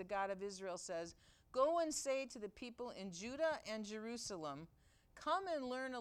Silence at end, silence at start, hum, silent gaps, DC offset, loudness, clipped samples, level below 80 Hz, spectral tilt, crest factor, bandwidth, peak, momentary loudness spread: 0 s; 0 s; none; none; under 0.1%; -43 LUFS; under 0.1%; -74 dBFS; -3 dB/octave; 20 dB; 15 kHz; -24 dBFS; 11 LU